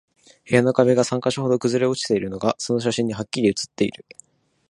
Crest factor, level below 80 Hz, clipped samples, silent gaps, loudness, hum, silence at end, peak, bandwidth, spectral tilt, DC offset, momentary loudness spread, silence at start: 20 dB; -58 dBFS; under 0.1%; none; -21 LUFS; none; 0.8 s; -2 dBFS; 11.5 kHz; -5 dB/octave; under 0.1%; 7 LU; 0.45 s